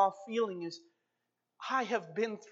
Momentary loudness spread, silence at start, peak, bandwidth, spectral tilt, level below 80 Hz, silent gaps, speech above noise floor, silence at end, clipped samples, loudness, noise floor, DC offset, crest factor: 12 LU; 0 s; -16 dBFS; 7.8 kHz; -4.5 dB/octave; under -90 dBFS; none; 49 dB; 0 s; under 0.1%; -35 LUFS; -85 dBFS; under 0.1%; 20 dB